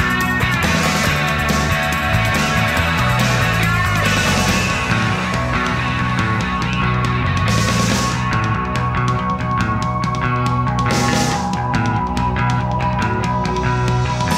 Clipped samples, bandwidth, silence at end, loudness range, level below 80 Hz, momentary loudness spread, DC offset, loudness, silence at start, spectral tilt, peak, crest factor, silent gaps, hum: under 0.1%; 16 kHz; 0 s; 2 LU; -30 dBFS; 4 LU; 0.1%; -17 LUFS; 0 s; -4.5 dB/octave; -2 dBFS; 14 dB; none; none